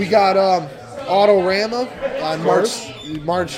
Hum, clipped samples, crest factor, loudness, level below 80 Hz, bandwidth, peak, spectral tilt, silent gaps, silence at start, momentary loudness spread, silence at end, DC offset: none; under 0.1%; 16 dB; -17 LUFS; -52 dBFS; 15.5 kHz; -2 dBFS; -4.5 dB/octave; none; 0 s; 13 LU; 0 s; under 0.1%